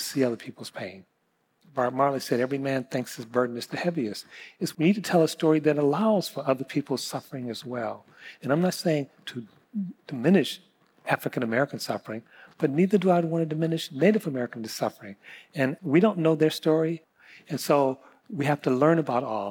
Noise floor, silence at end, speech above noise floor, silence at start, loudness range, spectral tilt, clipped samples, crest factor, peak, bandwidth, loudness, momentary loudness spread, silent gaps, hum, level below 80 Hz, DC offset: -72 dBFS; 0 s; 46 dB; 0 s; 4 LU; -6 dB/octave; under 0.1%; 18 dB; -10 dBFS; 19 kHz; -26 LUFS; 16 LU; none; none; -80 dBFS; under 0.1%